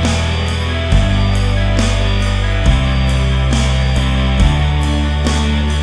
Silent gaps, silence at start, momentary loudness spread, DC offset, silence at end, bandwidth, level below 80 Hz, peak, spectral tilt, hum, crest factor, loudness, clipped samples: none; 0 s; 3 LU; under 0.1%; 0 s; 11 kHz; -16 dBFS; 0 dBFS; -5.5 dB/octave; none; 12 dB; -15 LUFS; under 0.1%